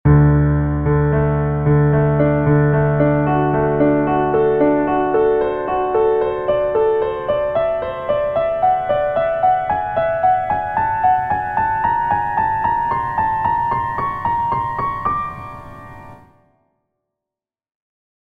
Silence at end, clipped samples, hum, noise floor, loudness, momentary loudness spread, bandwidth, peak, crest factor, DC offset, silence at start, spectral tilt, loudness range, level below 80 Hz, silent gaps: 2.1 s; under 0.1%; none; -88 dBFS; -17 LUFS; 6 LU; 4 kHz; -2 dBFS; 14 dB; under 0.1%; 0.05 s; -10.5 dB/octave; 7 LU; -34 dBFS; none